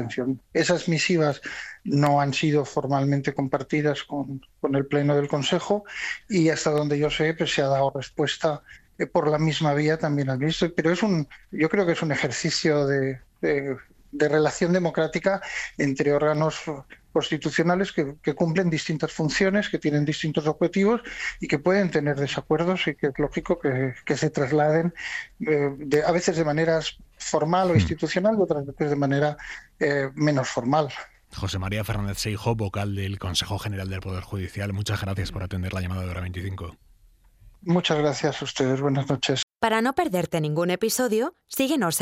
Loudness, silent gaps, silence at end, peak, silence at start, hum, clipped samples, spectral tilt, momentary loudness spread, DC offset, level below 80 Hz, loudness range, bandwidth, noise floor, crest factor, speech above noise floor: -25 LUFS; 39.43-39.48 s; 0 s; -6 dBFS; 0 s; none; under 0.1%; -5.5 dB/octave; 9 LU; under 0.1%; -50 dBFS; 5 LU; 15 kHz; -56 dBFS; 18 dB; 32 dB